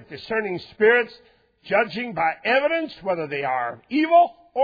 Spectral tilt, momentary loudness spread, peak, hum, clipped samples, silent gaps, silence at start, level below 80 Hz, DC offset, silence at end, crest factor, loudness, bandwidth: -7 dB/octave; 9 LU; -6 dBFS; none; under 0.1%; none; 0.1 s; -62 dBFS; under 0.1%; 0 s; 18 dB; -22 LUFS; 5 kHz